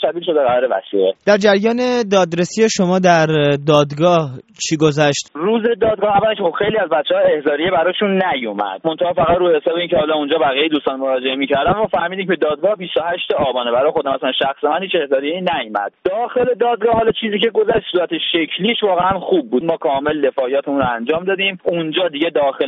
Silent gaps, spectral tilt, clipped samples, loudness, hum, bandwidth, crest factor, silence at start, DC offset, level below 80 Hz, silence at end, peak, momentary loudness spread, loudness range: none; -3.5 dB/octave; under 0.1%; -16 LUFS; none; 8 kHz; 16 dB; 0 s; under 0.1%; -50 dBFS; 0 s; 0 dBFS; 5 LU; 3 LU